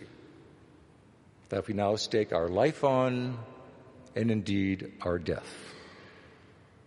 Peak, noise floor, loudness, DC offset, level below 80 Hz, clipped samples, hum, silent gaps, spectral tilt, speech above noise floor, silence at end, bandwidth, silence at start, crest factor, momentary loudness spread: -12 dBFS; -58 dBFS; -30 LUFS; under 0.1%; -60 dBFS; under 0.1%; none; none; -6 dB/octave; 29 dB; 0.65 s; 11.5 kHz; 0 s; 20 dB; 22 LU